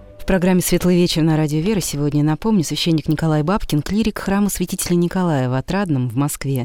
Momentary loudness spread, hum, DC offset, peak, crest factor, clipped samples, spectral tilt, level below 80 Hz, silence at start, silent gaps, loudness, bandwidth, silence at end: 4 LU; none; 0.3%; -4 dBFS; 14 dB; under 0.1%; -5.5 dB/octave; -36 dBFS; 0.1 s; none; -18 LUFS; 17.5 kHz; 0 s